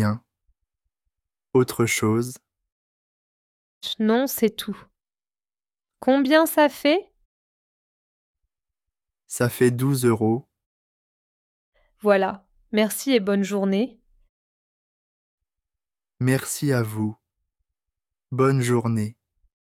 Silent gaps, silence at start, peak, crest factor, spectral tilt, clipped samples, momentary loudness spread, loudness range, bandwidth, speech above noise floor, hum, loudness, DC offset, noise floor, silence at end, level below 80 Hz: 2.72-3.81 s, 7.25-8.34 s, 10.66-11.73 s, 14.29-15.38 s; 0 s; -4 dBFS; 22 dB; -5.5 dB/octave; under 0.1%; 12 LU; 5 LU; 17 kHz; over 69 dB; none; -22 LUFS; under 0.1%; under -90 dBFS; 0.65 s; -64 dBFS